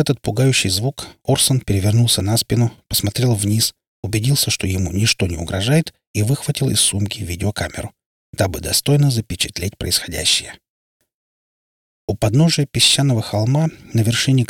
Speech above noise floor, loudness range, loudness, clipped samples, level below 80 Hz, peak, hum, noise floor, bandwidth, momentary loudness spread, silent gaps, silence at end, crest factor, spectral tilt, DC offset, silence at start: over 72 dB; 3 LU; -17 LUFS; under 0.1%; -42 dBFS; -2 dBFS; none; under -90 dBFS; 18.5 kHz; 9 LU; 3.87-4.03 s, 6.07-6.14 s, 8.06-8.33 s, 10.70-11.00 s, 11.14-12.08 s; 0.05 s; 16 dB; -4 dB/octave; under 0.1%; 0 s